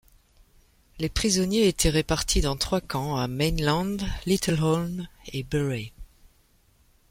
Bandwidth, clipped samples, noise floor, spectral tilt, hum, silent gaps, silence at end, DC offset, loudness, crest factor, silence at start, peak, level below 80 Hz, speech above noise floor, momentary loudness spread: 16.5 kHz; under 0.1%; -62 dBFS; -4.5 dB/octave; none; none; 1.05 s; under 0.1%; -26 LUFS; 18 dB; 0.95 s; -8 dBFS; -38 dBFS; 37 dB; 11 LU